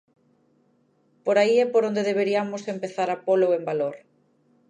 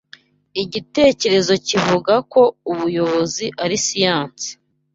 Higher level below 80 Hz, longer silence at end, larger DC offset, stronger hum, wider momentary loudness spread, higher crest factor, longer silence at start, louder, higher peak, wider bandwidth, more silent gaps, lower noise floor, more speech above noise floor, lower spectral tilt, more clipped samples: second, -82 dBFS vs -54 dBFS; first, 0.7 s vs 0.4 s; neither; neither; about the same, 11 LU vs 10 LU; about the same, 18 dB vs 16 dB; first, 1.25 s vs 0.55 s; second, -23 LUFS vs -17 LUFS; second, -6 dBFS vs -2 dBFS; first, 10 kHz vs 7.8 kHz; neither; first, -65 dBFS vs -48 dBFS; first, 42 dB vs 30 dB; first, -5.5 dB/octave vs -3.5 dB/octave; neither